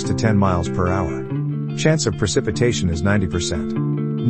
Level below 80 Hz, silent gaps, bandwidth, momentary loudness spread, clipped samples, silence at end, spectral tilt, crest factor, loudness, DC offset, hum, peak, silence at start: -38 dBFS; none; 8.8 kHz; 6 LU; under 0.1%; 0 s; -5.5 dB/octave; 18 dB; -20 LUFS; 0.6%; none; -2 dBFS; 0 s